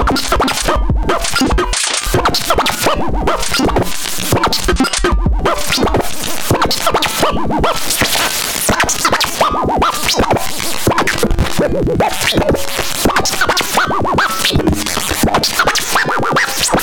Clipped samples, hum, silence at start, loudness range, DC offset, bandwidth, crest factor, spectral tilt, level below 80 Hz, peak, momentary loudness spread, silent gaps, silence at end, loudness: under 0.1%; none; 0 s; 1 LU; under 0.1%; 19.5 kHz; 10 dB; -3 dB/octave; -24 dBFS; -4 dBFS; 3 LU; none; 0 s; -14 LUFS